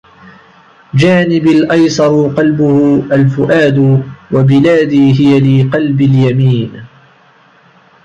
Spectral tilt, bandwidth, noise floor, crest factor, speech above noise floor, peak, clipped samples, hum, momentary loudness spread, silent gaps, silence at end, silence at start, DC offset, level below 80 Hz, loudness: -7.5 dB/octave; 8 kHz; -45 dBFS; 8 dB; 37 dB; 0 dBFS; under 0.1%; none; 4 LU; none; 1.2 s; 0.95 s; under 0.1%; -46 dBFS; -9 LUFS